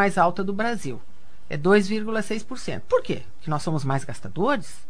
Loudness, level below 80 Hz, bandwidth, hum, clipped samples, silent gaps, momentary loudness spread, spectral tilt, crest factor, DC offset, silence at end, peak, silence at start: -25 LUFS; -52 dBFS; 11 kHz; none; under 0.1%; none; 13 LU; -6 dB/octave; 20 dB; 4%; 0.1 s; -4 dBFS; 0 s